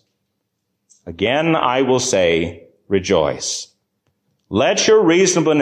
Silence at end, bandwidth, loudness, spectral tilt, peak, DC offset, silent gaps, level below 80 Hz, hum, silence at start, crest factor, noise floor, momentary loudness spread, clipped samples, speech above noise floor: 0 s; 10 kHz; -16 LUFS; -3.5 dB/octave; -4 dBFS; under 0.1%; none; -46 dBFS; none; 1.05 s; 14 dB; -73 dBFS; 11 LU; under 0.1%; 57 dB